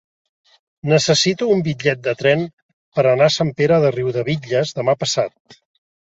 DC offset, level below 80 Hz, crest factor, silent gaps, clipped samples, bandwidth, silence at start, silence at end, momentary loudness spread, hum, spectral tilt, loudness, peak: under 0.1%; -56 dBFS; 18 dB; 2.53-2.92 s, 5.40-5.45 s; under 0.1%; 8 kHz; 0.85 s; 0.5 s; 7 LU; none; -4.5 dB/octave; -17 LUFS; -2 dBFS